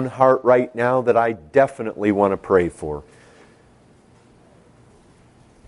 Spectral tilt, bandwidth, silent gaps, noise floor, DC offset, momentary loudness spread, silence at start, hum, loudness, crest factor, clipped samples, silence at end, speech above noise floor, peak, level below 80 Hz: -7.5 dB/octave; 11 kHz; none; -52 dBFS; under 0.1%; 10 LU; 0 s; none; -19 LUFS; 20 dB; under 0.1%; 2.65 s; 34 dB; -2 dBFS; -52 dBFS